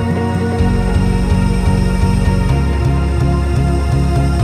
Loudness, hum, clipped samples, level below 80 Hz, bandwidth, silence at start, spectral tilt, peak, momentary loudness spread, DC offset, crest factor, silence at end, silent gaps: -15 LUFS; none; under 0.1%; -18 dBFS; 13.5 kHz; 0 s; -7.5 dB/octave; -2 dBFS; 1 LU; under 0.1%; 12 dB; 0 s; none